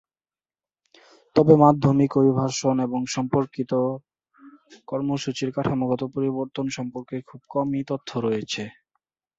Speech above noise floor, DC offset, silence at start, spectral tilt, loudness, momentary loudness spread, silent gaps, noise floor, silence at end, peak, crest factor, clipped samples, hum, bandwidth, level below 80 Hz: over 68 dB; under 0.1%; 1.35 s; -6.5 dB/octave; -23 LUFS; 15 LU; none; under -90 dBFS; 0.65 s; -2 dBFS; 22 dB; under 0.1%; none; 8 kHz; -58 dBFS